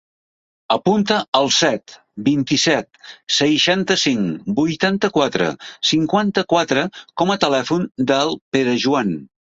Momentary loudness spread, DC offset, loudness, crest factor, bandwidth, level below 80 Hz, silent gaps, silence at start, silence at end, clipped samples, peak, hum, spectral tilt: 7 LU; under 0.1%; -18 LUFS; 16 dB; 8 kHz; -58 dBFS; 1.28-1.32 s, 8.41-8.52 s; 0.7 s; 0.3 s; under 0.1%; -2 dBFS; none; -4 dB/octave